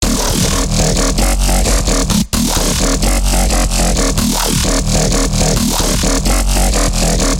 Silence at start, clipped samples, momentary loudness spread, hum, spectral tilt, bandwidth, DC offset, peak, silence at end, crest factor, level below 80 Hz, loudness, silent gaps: 0 s; under 0.1%; 1 LU; none; -3.5 dB/octave; 17 kHz; under 0.1%; -2 dBFS; 0 s; 12 dB; -16 dBFS; -13 LUFS; none